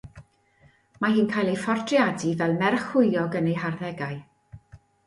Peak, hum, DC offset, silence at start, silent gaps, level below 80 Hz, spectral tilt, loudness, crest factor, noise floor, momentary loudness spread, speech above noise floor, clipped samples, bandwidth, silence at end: -6 dBFS; none; under 0.1%; 0.05 s; none; -60 dBFS; -6.5 dB/octave; -24 LUFS; 20 dB; -60 dBFS; 9 LU; 36 dB; under 0.1%; 11.5 kHz; 0.3 s